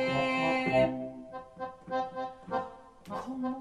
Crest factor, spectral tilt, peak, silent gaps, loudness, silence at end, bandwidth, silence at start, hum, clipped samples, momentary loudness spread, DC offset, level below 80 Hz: 18 dB; -6 dB/octave; -16 dBFS; none; -32 LUFS; 0 s; 11.5 kHz; 0 s; none; under 0.1%; 17 LU; under 0.1%; -60 dBFS